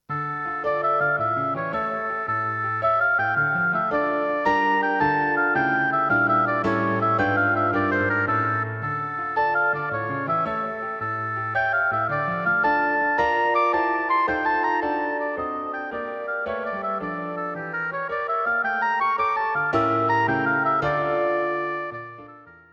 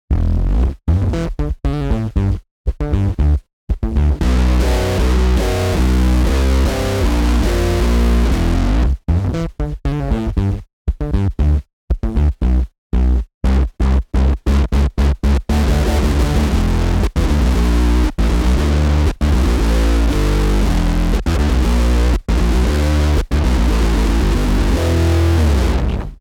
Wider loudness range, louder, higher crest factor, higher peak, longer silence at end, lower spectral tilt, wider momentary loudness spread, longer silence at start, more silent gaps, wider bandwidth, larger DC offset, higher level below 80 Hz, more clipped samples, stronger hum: about the same, 5 LU vs 3 LU; second, -23 LUFS vs -17 LUFS; about the same, 14 dB vs 10 dB; second, -10 dBFS vs -4 dBFS; first, 0.2 s vs 0.05 s; about the same, -7.5 dB/octave vs -6.5 dB/octave; about the same, 8 LU vs 6 LU; about the same, 0.1 s vs 0.1 s; second, none vs 2.51-2.64 s, 3.53-3.67 s, 10.73-10.85 s, 11.73-11.88 s, 12.78-12.90 s, 13.34-13.41 s; second, 7 kHz vs 15.5 kHz; neither; second, -56 dBFS vs -16 dBFS; neither; neither